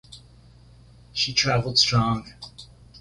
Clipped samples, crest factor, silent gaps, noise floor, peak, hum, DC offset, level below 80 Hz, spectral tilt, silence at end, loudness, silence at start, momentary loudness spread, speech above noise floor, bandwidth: under 0.1%; 20 dB; none; -51 dBFS; -6 dBFS; none; under 0.1%; -50 dBFS; -3.5 dB/octave; 0 s; -21 LUFS; 0.1 s; 22 LU; 28 dB; 11.5 kHz